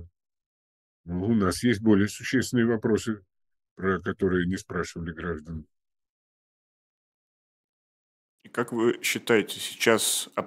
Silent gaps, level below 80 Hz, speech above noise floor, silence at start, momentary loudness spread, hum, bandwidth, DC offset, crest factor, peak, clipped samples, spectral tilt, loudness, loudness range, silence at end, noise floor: 0.46-1.04 s, 3.71-3.76 s, 6.10-8.38 s; -56 dBFS; over 64 dB; 0 s; 12 LU; none; 16 kHz; under 0.1%; 22 dB; -6 dBFS; under 0.1%; -4.5 dB/octave; -26 LUFS; 14 LU; 0 s; under -90 dBFS